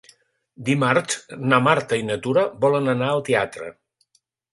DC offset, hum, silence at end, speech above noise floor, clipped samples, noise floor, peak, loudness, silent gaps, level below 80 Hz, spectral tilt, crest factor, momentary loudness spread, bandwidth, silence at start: under 0.1%; none; 0.8 s; 47 dB; under 0.1%; -67 dBFS; 0 dBFS; -21 LUFS; none; -62 dBFS; -5 dB/octave; 22 dB; 11 LU; 11.5 kHz; 0.6 s